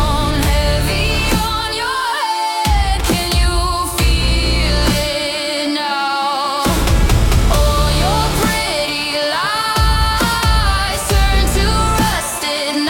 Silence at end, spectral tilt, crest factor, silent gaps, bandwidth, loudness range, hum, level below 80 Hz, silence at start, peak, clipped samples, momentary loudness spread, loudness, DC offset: 0 s; -4 dB/octave; 14 dB; none; 17 kHz; 1 LU; none; -18 dBFS; 0 s; -2 dBFS; under 0.1%; 3 LU; -15 LUFS; under 0.1%